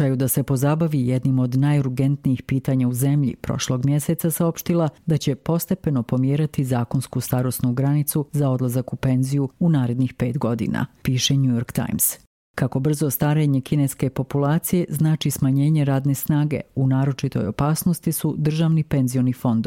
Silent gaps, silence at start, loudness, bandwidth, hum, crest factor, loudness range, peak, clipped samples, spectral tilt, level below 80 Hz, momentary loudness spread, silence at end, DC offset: 12.27-12.54 s; 0 s; -21 LUFS; 16.5 kHz; none; 14 dB; 2 LU; -6 dBFS; under 0.1%; -6 dB/octave; -50 dBFS; 4 LU; 0 s; under 0.1%